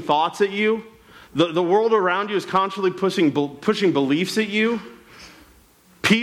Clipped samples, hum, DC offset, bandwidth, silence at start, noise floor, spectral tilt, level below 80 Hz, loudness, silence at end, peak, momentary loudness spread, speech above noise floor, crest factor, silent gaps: under 0.1%; none; under 0.1%; 15.5 kHz; 0 s; -53 dBFS; -5 dB/octave; -62 dBFS; -21 LUFS; 0 s; -6 dBFS; 5 LU; 33 dB; 16 dB; none